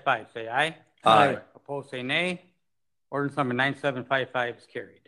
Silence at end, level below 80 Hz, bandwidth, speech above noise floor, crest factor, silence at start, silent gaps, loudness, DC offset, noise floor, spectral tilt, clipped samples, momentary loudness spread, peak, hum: 0.2 s; -72 dBFS; 12 kHz; 61 dB; 22 dB; 0.05 s; none; -26 LUFS; under 0.1%; -87 dBFS; -5 dB/octave; under 0.1%; 17 LU; -6 dBFS; none